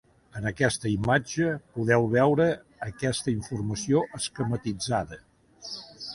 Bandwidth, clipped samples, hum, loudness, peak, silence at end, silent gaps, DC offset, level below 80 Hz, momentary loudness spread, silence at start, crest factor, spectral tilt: 11.5 kHz; under 0.1%; none; -27 LUFS; -8 dBFS; 0 s; none; under 0.1%; -52 dBFS; 16 LU; 0.35 s; 20 dB; -5.5 dB/octave